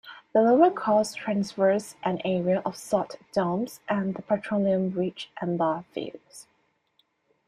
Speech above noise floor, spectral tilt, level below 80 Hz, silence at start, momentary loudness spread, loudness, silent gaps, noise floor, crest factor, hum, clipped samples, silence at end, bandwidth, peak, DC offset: 44 dB; -6.5 dB/octave; -68 dBFS; 0.05 s; 11 LU; -26 LUFS; none; -70 dBFS; 18 dB; none; under 0.1%; 1.05 s; 14 kHz; -8 dBFS; under 0.1%